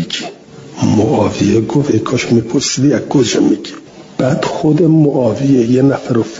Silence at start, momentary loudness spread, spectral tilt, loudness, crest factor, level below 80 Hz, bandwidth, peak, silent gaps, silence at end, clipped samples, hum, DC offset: 0 s; 10 LU; -6 dB/octave; -13 LUFS; 12 dB; -48 dBFS; 7.8 kHz; 0 dBFS; none; 0 s; under 0.1%; none; under 0.1%